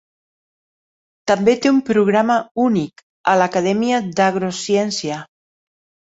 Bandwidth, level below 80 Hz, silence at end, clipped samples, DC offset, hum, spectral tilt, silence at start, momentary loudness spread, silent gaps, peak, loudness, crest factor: 8 kHz; -60 dBFS; 0.9 s; under 0.1%; under 0.1%; none; -5 dB/octave; 1.25 s; 9 LU; 2.51-2.55 s, 3.03-3.24 s; -2 dBFS; -17 LUFS; 16 dB